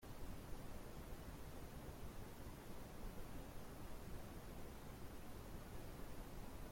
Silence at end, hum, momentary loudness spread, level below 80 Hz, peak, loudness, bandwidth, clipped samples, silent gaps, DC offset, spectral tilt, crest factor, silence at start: 0 s; none; 1 LU; -56 dBFS; -36 dBFS; -56 LUFS; 16.5 kHz; under 0.1%; none; under 0.1%; -5.5 dB/octave; 14 dB; 0 s